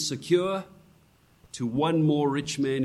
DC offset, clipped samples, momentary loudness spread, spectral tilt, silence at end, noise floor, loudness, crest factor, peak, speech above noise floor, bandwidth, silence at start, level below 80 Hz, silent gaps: under 0.1%; under 0.1%; 11 LU; -5.5 dB/octave; 0 s; -60 dBFS; -26 LUFS; 16 dB; -10 dBFS; 35 dB; 13 kHz; 0 s; -62 dBFS; none